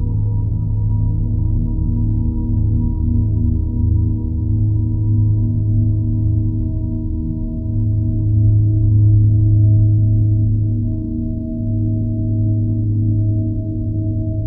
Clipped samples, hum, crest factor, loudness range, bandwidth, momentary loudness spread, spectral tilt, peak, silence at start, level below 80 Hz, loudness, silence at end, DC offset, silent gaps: under 0.1%; none; 12 dB; 4 LU; 1 kHz; 8 LU; -16 dB/octave; -4 dBFS; 0 s; -22 dBFS; -17 LUFS; 0 s; under 0.1%; none